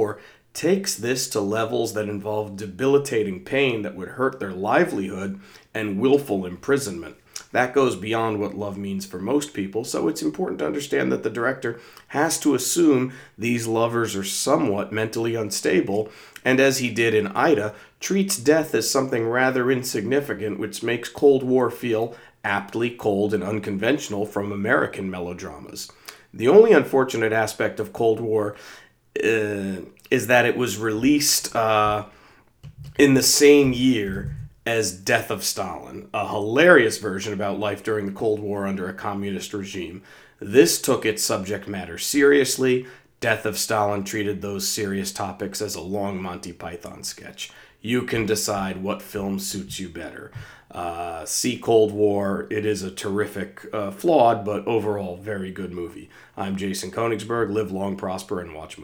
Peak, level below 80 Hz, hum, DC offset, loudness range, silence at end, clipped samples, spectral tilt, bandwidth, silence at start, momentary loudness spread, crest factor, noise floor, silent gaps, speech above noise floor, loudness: 0 dBFS; -56 dBFS; none; under 0.1%; 7 LU; 0 s; under 0.1%; -4 dB/octave; over 20 kHz; 0 s; 15 LU; 22 dB; -49 dBFS; none; 27 dB; -22 LUFS